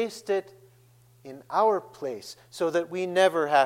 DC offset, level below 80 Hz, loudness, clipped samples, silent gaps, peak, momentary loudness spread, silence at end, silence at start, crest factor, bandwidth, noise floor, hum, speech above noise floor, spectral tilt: under 0.1%; -78 dBFS; -26 LUFS; under 0.1%; none; -8 dBFS; 18 LU; 0 s; 0 s; 18 dB; 16.5 kHz; -58 dBFS; none; 32 dB; -4 dB/octave